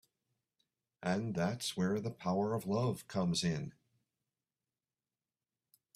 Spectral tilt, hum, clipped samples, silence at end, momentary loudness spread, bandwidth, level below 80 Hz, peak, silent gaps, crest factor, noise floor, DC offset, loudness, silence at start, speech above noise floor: -5.5 dB/octave; none; under 0.1%; 2.25 s; 4 LU; 14.5 kHz; -70 dBFS; -20 dBFS; none; 20 dB; under -90 dBFS; under 0.1%; -36 LUFS; 1 s; over 55 dB